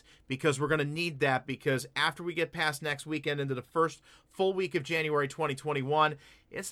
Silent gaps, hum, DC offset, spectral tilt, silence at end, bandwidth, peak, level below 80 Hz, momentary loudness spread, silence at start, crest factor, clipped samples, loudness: none; none; under 0.1%; -4.5 dB/octave; 0 s; 15.5 kHz; -12 dBFS; -66 dBFS; 6 LU; 0.3 s; 18 dB; under 0.1%; -31 LUFS